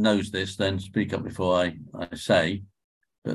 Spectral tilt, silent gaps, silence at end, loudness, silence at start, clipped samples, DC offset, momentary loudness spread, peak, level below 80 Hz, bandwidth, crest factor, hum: -5.5 dB/octave; 2.84-3.01 s, 3.18-3.22 s; 0 s; -26 LUFS; 0 s; under 0.1%; under 0.1%; 13 LU; -8 dBFS; -50 dBFS; 12.5 kHz; 20 dB; none